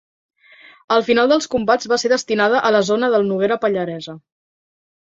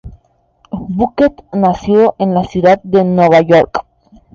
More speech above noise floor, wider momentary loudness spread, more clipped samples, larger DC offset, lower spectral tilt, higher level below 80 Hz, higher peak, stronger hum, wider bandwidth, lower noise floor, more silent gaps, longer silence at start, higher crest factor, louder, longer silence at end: second, 30 dB vs 42 dB; second, 7 LU vs 12 LU; neither; neither; second, -4 dB/octave vs -8 dB/octave; second, -58 dBFS vs -40 dBFS; about the same, -2 dBFS vs 0 dBFS; neither; about the same, 7.8 kHz vs 7.4 kHz; second, -47 dBFS vs -53 dBFS; neither; first, 0.9 s vs 0.05 s; about the same, 16 dB vs 12 dB; second, -17 LUFS vs -12 LUFS; first, 0.95 s vs 0.55 s